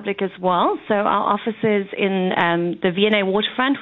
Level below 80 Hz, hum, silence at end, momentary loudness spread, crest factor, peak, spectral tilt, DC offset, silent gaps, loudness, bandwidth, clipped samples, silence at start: -62 dBFS; none; 0 s; 4 LU; 18 dB; -2 dBFS; -8.5 dB/octave; under 0.1%; none; -19 LUFS; 4.2 kHz; under 0.1%; 0 s